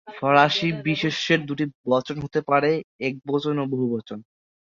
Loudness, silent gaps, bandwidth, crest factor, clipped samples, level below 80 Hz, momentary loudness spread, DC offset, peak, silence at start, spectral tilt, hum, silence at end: -23 LUFS; 1.75-1.84 s, 2.84-2.99 s; 7.6 kHz; 22 dB; under 0.1%; -62 dBFS; 11 LU; under 0.1%; -2 dBFS; 0.05 s; -6 dB/octave; none; 0.5 s